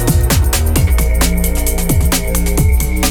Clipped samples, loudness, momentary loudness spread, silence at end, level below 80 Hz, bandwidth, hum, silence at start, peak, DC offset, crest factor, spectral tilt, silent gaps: under 0.1%; -14 LUFS; 3 LU; 0 s; -14 dBFS; over 20 kHz; none; 0 s; 0 dBFS; under 0.1%; 12 dB; -4.5 dB/octave; none